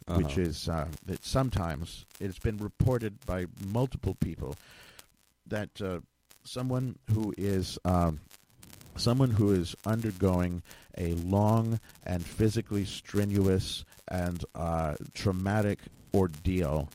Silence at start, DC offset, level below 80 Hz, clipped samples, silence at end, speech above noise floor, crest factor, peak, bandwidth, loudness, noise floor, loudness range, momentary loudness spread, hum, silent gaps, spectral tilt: 0.05 s; under 0.1%; -46 dBFS; under 0.1%; 0.05 s; 30 dB; 18 dB; -12 dBFS; 16.5 kHz; -31 LUFS; -60 dBFS; 6 LU; 12 LU; none; none; -6.5 dB/octave